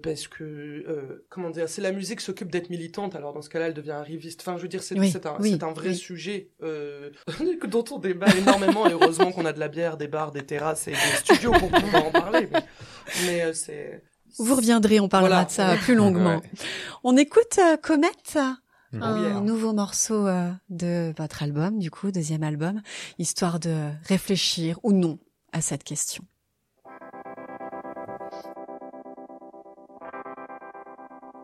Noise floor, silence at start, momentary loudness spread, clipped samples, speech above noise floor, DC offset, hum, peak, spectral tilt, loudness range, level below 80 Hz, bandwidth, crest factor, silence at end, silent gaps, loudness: -73 dBFS; 0.05 s; 21 LU; under 0.1%; 49 dB; under 0.1%; none; -2 dBFS; -4.5 dB/octave; 12 LU; -52 dBFS; 15 kHz; 22 dB; 0 s; none; -24 LUFS